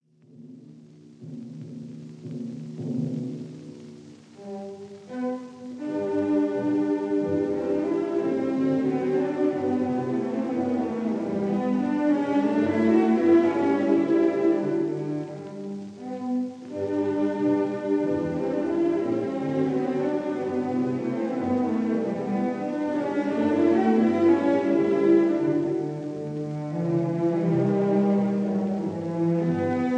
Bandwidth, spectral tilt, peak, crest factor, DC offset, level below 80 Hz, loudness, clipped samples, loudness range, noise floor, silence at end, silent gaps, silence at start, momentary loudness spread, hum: 8.6 kHz; -8.5 dB/octave; -8 dBFS; 16 dB; under 0.1%; -68 dBFS; -25 LUFS; under 0.1%; 12 LU; -49 dBFS; 0 s; none; 0.4 s; 16 LU; none